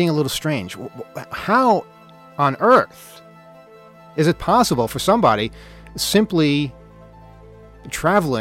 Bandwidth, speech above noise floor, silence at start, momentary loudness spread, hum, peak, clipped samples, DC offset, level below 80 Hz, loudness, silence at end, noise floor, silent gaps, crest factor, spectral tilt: 16.5 kHz; 26 dB; 0 s; 16 LU; none; -2 dBFS; under 0.1%; under 0.1%; -46 dBFS; -18 LUFS; 0 s; -44 dBFS; none; 16 dB; -5 dB/octave